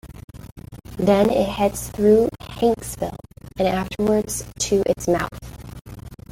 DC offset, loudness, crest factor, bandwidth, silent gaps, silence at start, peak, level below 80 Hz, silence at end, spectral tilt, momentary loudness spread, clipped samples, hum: under 0.1%; -21 LUFS; 18 dB; 17 kHz; 0.24-0.28 s, 5.81-5.85 s; 0.05 s; -4 dBFS; -42 dBFS; 0.15 s; -5 dB/octave; 23 LU; under 0.1%; none